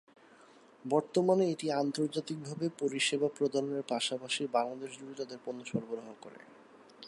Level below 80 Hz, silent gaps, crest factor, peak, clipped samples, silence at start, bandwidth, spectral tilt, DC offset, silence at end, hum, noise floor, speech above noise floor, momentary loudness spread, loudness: -82 dBFS; none; 20 dB; -16 dBFS; under 0.1%; 0.85 s; 11.5 kHz; -4.5 dB/octave; under 0.1%; 0 s; none; -59 dBFS; 26 dB; 14 LU; -33 LUFS